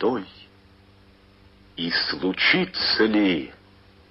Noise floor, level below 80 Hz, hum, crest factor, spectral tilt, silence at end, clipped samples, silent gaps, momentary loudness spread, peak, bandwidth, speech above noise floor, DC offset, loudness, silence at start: -53 dBFS; -56 dBFS; none; 20 dB; -7.5 dB/octave; 0.55 s; under 0.1%; none; 18 LU; -6 dBFS; 5.8 kHz; 31 dB; under 0.1%; -22 LUFS; 0 s